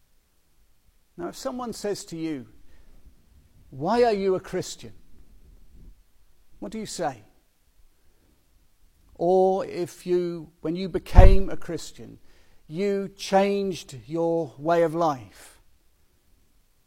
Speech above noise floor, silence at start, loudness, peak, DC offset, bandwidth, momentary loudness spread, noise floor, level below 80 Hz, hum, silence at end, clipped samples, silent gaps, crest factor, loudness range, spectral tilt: 39 dB; 1.2 s; -26 LUFS; 0 dBFS; under 0.1%; 12.5 kHz; 17 LU; -62 dBFS; -30 dBFS; none; 1.6 s; under 0.1%; none; 24 dB; 15 LU; -6.5 dB/octave